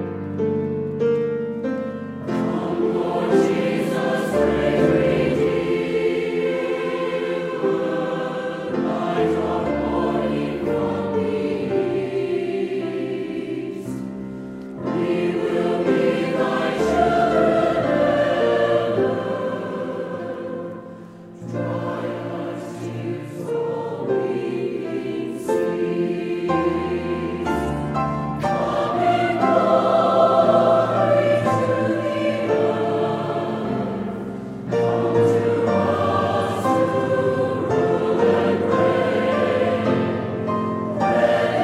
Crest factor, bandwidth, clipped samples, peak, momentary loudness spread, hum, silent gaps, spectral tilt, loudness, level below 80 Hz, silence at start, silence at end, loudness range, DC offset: 18 dB; 14 kHz; under 0.1%; -4 dBFS; 10 LU; none; none; -7 dB/octave; -21 LUFS; -48 dBFS; 0 s; 0 s; 8 LU; under 0.1%